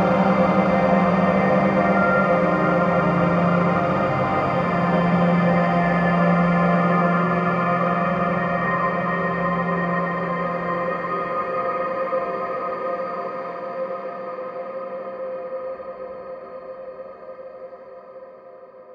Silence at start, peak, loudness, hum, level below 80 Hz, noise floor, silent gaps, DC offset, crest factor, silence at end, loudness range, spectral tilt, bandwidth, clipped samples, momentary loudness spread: 0 s; -6 dBFS; -21 LUFS; none; -50 dBFS; -43 dBFS; none; under 0.1%; 16 dB; 0 s; 14 LU; -9 dB/octave; 6.4 kHz; under 0.1%; 18 LU